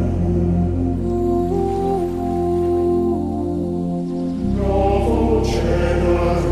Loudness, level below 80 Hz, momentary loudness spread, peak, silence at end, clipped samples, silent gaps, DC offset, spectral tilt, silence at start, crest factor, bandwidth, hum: -19 LUFS; -26 dBFS; 5 LU; -4 dBFS; 0 s; under 0.1%; none; 0.5%; -8.5 dB/octave; 0 s; 14 dB; 12.5 kHz; none